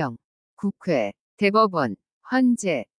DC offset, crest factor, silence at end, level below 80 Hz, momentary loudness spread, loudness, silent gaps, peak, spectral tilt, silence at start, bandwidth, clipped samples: under 0.1%; 18 dB; 0.15 s; -70 dBFS; 11 LU; -23 LUFS; 0.24-0.57 s, 1.20-1.38 s, 2.13-2.21 s; -6 dBFS; -5.5 dB/octave; 0 s; 10.5 kHz; under 0.1%